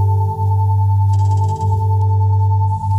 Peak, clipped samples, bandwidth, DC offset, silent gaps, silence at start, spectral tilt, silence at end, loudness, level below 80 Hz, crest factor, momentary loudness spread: -6 dBFS; under 0.1%; 1 kHz; under 0.1%; none; 0 s; -9.5 dB/octave; 0 s; -16 LUFS; -42 dBFS; 8 dB; 2 LU